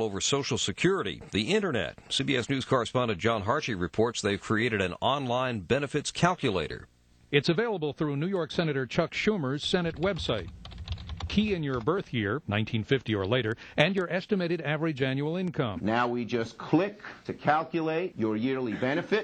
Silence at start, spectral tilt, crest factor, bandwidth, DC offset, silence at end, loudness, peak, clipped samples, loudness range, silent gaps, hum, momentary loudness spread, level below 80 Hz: 0 s; -5 dB/octave; 22 dB; 9.2 kHz; under 0.1%; 0 s; -29 LUFS; -6 dBFS; under 0.1%; 2 LU; none; none; 5 LU; -52 dBFS